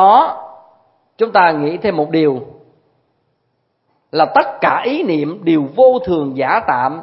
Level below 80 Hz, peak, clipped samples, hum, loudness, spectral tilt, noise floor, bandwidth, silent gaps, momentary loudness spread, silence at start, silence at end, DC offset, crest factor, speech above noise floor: -56 dBFS; 0 dBFS; under 0.1%; none; -14 LUFS; -9 dB/octave; -66 dBFS; 5.8 kHz; none; 8 LU; 0 s; 0 s; under 0.1%; 16 dB; 52 dB